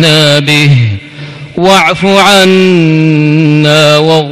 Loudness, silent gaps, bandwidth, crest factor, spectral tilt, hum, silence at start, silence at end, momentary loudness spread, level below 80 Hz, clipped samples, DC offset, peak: -5 LUFS; none; 15.5 kHz; 6 dB; -5 dB/octave; none; 0 s; 0 s; 10 LU; -42 dBFS; 2%; under 0.1%; 0 dBFS